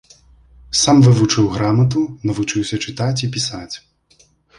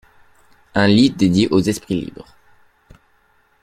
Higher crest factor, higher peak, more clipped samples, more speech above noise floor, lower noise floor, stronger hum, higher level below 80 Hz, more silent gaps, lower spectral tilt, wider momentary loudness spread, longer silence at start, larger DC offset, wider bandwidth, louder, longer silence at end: about the same, 16 dB vs 18 dB; about the same, -2 dBFS vs -2 dBFS; neither; about the same, 39 dB vs 42 dB; about the same, -55 dBFS vs -58 dBFS; neither; about the same, -46 dBFS vs -48 dBFS; neither; about the same, -5 dB/octave vs -6 dB/octave; about the same, 12 LU vs 11 LU; about the same, 0.7 s vs 0.75 s; neither; second, 11.5 kHz vs 14.5 kHz; about the same, -16 LUFS vs -16 LUFS; second, 0.8 s vs 1.4 s